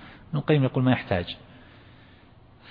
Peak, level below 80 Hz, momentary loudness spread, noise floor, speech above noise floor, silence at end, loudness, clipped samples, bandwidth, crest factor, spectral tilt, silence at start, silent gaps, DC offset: -6 dBFS; -56 dBFS; 13 LU; -53 dBFS; 29 dB; 0 s; -25 LUFS; under 0.1%; 5 kHz; 22 dB; -10.5 dB/octave; 0 s; none; under 0.1%